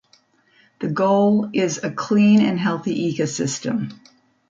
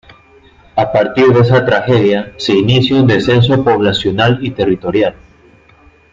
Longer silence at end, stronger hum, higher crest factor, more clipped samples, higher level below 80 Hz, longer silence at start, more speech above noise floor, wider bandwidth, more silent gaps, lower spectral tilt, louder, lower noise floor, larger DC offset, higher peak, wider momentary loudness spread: second, 0.55 s vs 1 s; neither; about the same, 14 dB vs 12 dB; neither; second, -64 dBFS vs -42 dBFS; about the same, 0.8 s vs 0.75 s; first, 39 dB vs 34 dB; about the same, 7.8 kHz vs 7.6 kHz; neither; second, -5.5 dB/octave vs -7 dB/octave; second, -20 LUFS vs -12 LUFS; first, -58 dBFS vs -45 dBFS; neither; second, -6 dBFS vs 0 dBFS; first, 11 LU vs 6 LU